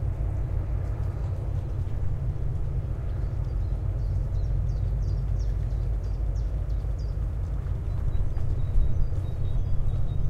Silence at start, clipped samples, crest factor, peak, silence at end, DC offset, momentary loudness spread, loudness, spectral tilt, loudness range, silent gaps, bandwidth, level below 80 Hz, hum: 0 s; under 0.1%; 14 dB; -12 dBFS; 0 s; under 0.1%; 2 LU; -30 LUFS; -9 dB/octave; 1 LU; none; 6.2 kHz; -28 dBFS; none